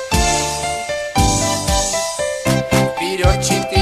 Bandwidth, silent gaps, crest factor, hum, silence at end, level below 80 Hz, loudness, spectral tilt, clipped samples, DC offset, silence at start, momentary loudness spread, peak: 14 kHz; none; 16 dB; none; 0 s; -26 dBFS; -17 LUFS; -3.5 dB/octave; under 0.1%; under 0.1%; 0 s; 5 LU; 0 dBFS